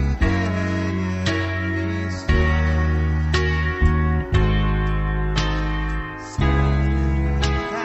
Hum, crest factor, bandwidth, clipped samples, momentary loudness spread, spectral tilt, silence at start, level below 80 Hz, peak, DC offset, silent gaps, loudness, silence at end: none; 14 dB; 8.2 kHz; under 0.1%; 5 LU; -6.5 dB/octave; 0 s; -24 dBFS; -6 dBFS; under 0.1%; none; -21 LUFS; 0 s